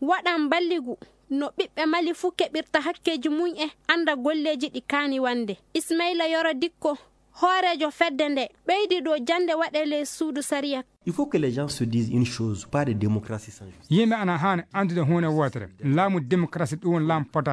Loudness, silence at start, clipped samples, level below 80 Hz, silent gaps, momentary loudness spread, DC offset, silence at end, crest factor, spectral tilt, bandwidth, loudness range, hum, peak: -25 LUFS; 0 s; under 0.1%; -62 dBFS; none; 7 LU; under 0.1%; 0 s; 20 dB; -5.5 dB/octave; 11 kHz; 2 LU; none; -4 dBFS